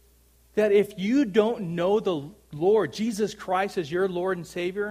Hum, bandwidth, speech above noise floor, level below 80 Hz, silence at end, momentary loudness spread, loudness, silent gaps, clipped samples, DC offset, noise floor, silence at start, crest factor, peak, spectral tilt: none; 15 kHz; 34 dB; -60 dBFS; 0 s; 8 LU; -25 LUFS; none; under 0.1%; under 0.1%; -59 dBFS; 0.55 s; 18 dB; -8 dBFS; -6 dB/octave